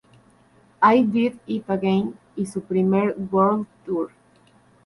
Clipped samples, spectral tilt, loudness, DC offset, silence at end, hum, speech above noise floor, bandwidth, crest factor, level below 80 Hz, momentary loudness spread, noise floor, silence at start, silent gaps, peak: under 0.1%; -7.5 dB/octave; -22 LUFS; under 0.1%; 0.8 s; none; 35 dB; 11.5 kHz; 18 dB; -62 dBFS; 12 LU; -56 dBFS; 0.8 s; none; -4 dBFS